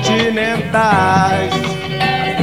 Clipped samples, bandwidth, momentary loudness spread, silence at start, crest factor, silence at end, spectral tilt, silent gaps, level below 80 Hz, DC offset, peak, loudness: under 0.1%; 16 kHz; 6 LU; 0 s; 14 dB; 0 s; -5 dB/octave; none; -44 dBFS; 0.6%; 0 dBFS; -15 LUFS